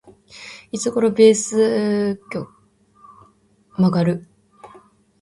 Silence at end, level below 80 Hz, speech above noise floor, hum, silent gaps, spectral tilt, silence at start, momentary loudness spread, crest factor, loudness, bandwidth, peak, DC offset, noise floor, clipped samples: 0.55 s; -60 dBFS; 39 dB; none; none; -5.5 dB/octave; 0.35 s; 23 LU; 18 dB; -19 LUFS; 11.5 kHz; -2 dBFS; under 0.1%; -56 dBFS; under 0.1%